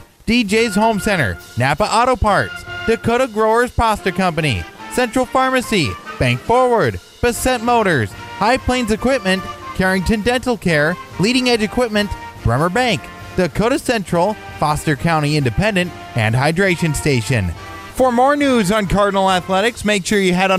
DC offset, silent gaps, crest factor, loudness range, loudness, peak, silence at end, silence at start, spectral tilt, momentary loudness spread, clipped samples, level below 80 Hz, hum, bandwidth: under 0.1%; none; 14 dB; 2 LU; -17 LUFS; -2 dBFS; 0 s; 0 s; -5 dB/octave; 6 LU; under 0.1%; -36 dBFS; none; 15.5 kHz